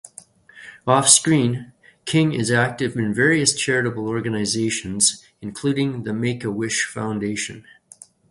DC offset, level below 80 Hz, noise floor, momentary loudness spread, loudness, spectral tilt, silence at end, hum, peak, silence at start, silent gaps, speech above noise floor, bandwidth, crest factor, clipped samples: under 0.1%; -56 dBFS; -48 dBFS; 12 LU; -20 LUFS; -3.5 dB/octave; 0.7 s; none; 0 dBFS; 0.55 s; none; 28 dB; 11.5 kHz; 22 dB; under 0.1%